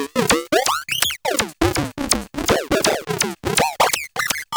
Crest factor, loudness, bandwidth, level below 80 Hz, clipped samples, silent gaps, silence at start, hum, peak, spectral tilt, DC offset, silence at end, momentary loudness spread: 18 dB; -19 LUFS; over 20 kHz; -40 dBFS; under 0.1%; none; 0 s; none; -2 dBFS; -2.5 dB/octave; under 0.1%; 0 s; 4 LU